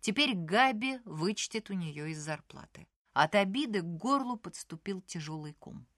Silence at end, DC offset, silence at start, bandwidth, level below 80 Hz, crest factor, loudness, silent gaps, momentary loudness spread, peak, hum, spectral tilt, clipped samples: 0.15 s; under 0.1%; 0.05 s; 12.5 kHz; -70 dBFS; 22 dB; -32 LUFS; 2.96-3.05 s; 16 LU; -10 dBFS; none; -4 dB/octave; under 0.1%